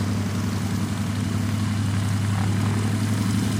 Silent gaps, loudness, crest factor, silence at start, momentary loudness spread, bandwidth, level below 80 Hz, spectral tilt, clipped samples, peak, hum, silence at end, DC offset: none; -24 LUFS; 12 dB; 0 s; 3 LU; 16 kHz; -46 dBFS; -6 dB/octave; under 0.1%; -12 dBFS; none; 0 s; under 0.1%